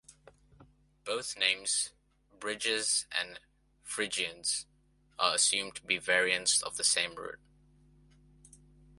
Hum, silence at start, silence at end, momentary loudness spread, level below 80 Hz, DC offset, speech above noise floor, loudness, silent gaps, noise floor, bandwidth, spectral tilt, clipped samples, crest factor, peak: none; 0.1 s; 1.65 s; 15 LU; -68 dBFS; under 0.1%; 31 dB; -30 LUFS; none; -63 dBFS; 12 kHz; 0.5 dB/octave; under 0.1%; 24 dB; -10 dBFS